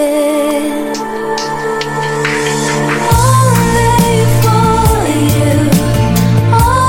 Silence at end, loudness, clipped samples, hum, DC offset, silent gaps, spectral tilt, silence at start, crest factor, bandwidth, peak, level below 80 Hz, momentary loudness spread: 0 s; -11 LUFS; under 0.1%; none; 0.5%; none; -5.5 dB/octave; 0 s; 10 dB; 17 kHz; 0 dBFS; -24 dBFS; 7 LU